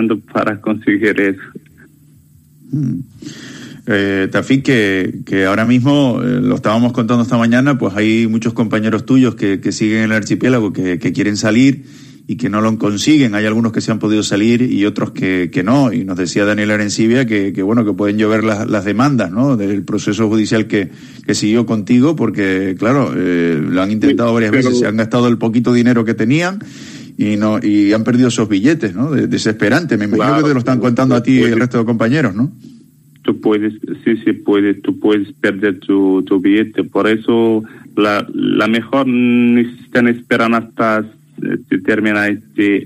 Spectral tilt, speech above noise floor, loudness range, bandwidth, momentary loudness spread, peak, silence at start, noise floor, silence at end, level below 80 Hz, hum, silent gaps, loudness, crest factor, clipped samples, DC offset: -6 dB/octave; 32 dB; 3 LU; 12.5 kHz; 6 LU; 0 dBFS; 0 s; -46 dBFS; 0 s; -52 dBFS; none; none; -14 LUFS; 14 dB; under 0.1%; under 0.1%